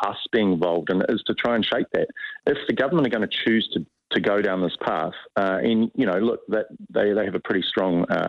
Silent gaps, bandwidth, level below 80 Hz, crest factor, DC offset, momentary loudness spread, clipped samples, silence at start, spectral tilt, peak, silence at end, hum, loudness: none; 7 kHz; -60 dBFS; 16 dB; under 0.1%; 6 LU; under 0.1%; 0 s; -7.5 dB/octave; -6 dBFS; 0 s; none; -23 LUFS